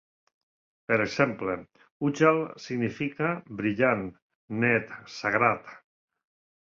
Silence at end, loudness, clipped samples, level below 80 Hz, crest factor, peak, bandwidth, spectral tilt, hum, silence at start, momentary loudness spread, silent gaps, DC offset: 0.9 s; -27 LUFS; under 0.1%; -64 dBFS; 22 dB; -6 dBFS; 7.4 kHz; -6.5 dB/octave; none; 0.9 s; 12 LU; 1.91-2.00 s, 4.22-4.48 s; under 0.1%